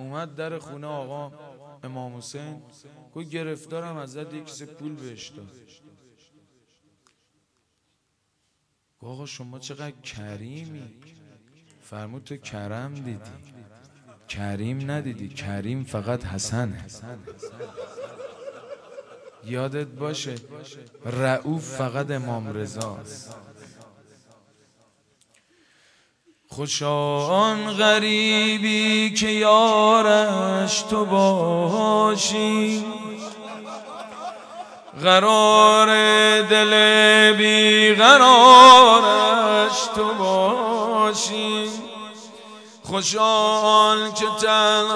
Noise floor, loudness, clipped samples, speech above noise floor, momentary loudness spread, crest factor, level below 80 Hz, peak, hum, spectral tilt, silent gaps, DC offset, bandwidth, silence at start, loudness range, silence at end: -73 dBFS; -16 LUFS; under 0.1%; 54 dB; 25 LU; 20 dB; -62 dBFS; 0 dBFS; none; -3 dB/octave; none; under 0.1%; 11 kHz; 0 s; 26 LU; 0 s